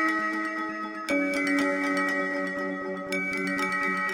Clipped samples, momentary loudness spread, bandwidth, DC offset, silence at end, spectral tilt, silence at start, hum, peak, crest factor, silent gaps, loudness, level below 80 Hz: under 0.1%; 6 LU; 16.5 kHz; under 0.1%; 0 s; -4.5 dB/octave; 0 s; none; -12 dBFS; 16 dB; none; -27 LUFS; -68 dBFS